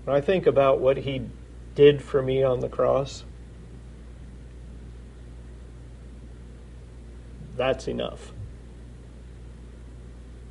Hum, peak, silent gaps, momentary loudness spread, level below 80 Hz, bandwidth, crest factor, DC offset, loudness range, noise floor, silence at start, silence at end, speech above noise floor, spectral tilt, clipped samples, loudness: none; -6 dBFS; none; 25 LU; -44 dBFS; 10.5 kHz; 22 dB; under 0.1%; 22 LU; -43 dBFS; 0 s; 0 s; 20 dB; -6.5 dB/octave; under 0.1%; -23 LUFS